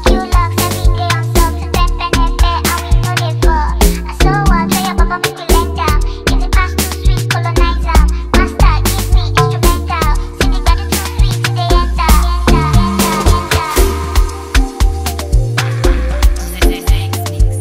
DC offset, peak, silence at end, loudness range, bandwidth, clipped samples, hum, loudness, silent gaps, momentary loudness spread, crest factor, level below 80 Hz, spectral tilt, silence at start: under 0.1%; 0 dBFS; 0 s; 2 LU; 16.5 kHz; under 0.1%; none; -14 LUFS; none; 4 LU; 12 dB; -14 dBFS; -5 dB/octave; 0 s